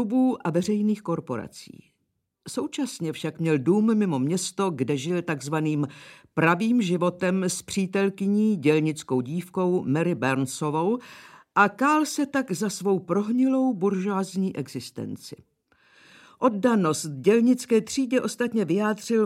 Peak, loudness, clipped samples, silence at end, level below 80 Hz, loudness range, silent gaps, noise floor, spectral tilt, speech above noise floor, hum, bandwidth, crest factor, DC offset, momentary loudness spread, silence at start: -6 dBFS; -25 LUFS; under 0.1%; 0 s; -70 dBFS; 4 LU; none; -76 dBFS; -5.5 dB/octave; 52 dB; none; 15.5 kHz; 18 dB; under 0.1%; 10 LU; 0 s